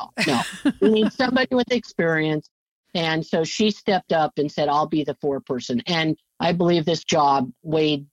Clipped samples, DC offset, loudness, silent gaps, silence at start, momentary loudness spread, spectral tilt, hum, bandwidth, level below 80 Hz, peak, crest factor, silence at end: under 0.1%; under 0.1%; -22 LUFS; 2.51-2.84 s; 0 s; 7 LU; -5 dB/octave; none; 16 kHz; -60 dBFS; -6 dBFS; 16 dB; 0.1 s